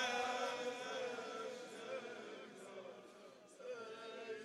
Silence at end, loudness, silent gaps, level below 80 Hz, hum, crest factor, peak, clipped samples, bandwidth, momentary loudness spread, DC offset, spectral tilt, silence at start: 0 s; -46 LUFS; none; under -90 dBFS; none; 20 dB; -26 dBFS; under 0.1%; 13 kHz; 15 LU; under 0.1%; -2 dB/octave; 0 s